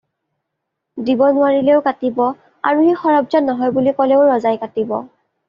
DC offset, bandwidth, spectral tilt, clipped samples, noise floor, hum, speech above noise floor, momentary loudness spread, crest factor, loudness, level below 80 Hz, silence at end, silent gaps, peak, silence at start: under 0.1%; 5.6 kHz; -4.5 dB/octave; under 0.1%; -77 dBFS; none; 62 dB; 9 LU; 14 dB; -16 LUFS; -62 dBFS; 0.45 s; none; -2 dBFS; 0.95 s